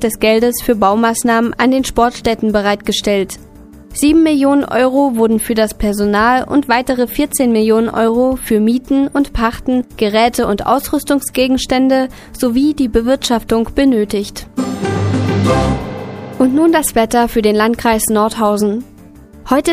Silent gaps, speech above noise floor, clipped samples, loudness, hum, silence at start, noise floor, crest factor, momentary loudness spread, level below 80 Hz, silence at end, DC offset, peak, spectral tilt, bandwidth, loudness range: none; 25 dB; under 0.1%; -14 LUFS; none; 0 s; -38 dBFS; 14 dB; 6 LU; -34 dBFS; 0 s; under 0.1%; 0 dBFS; -5 dB/octave; 15.5 kHz; 2 LU